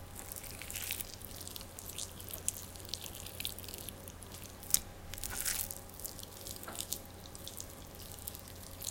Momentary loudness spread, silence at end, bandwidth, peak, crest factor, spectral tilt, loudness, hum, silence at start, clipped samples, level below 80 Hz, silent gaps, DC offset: 13 LU; 0 s; 17 kHz; 0 dBFS; 42 dB; -1.5 dB/octave; -41 LUFS; none; 0 s; under 0.1%; -56 dBFS; none; under 0.1%